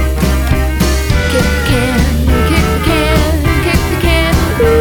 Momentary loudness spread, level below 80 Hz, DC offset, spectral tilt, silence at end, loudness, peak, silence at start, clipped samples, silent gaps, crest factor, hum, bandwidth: 2 LU; -14 dBFS; under 0.1%; -5.5 dB/octave; 0 s; -12 LUFS; 0 dBFS; 0 s; under 0.1%; none; 10 dB; none; 19 kHz